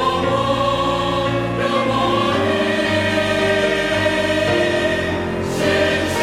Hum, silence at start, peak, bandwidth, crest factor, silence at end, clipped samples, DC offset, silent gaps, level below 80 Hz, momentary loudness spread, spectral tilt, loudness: none; 0 s; -6 dBFS; 16 kHz; 12 dB; 0 s; under 0.1%; under 0.1%; none; -40 dBFS; 3 LU; -5 dB/octave; -18 LUFS